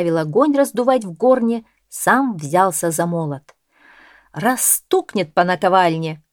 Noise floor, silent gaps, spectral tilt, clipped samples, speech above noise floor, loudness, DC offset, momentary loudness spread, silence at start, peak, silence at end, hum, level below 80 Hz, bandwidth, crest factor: -50 dBFS; none; -4.5 dB/octave; under 0.1%; 33 dB; -17 LUFS; under 0.1%; 10 LU; 0 s; 0 dBFS; 0.15 s; none; -64 dBFS; over 20 kHz; 18 dB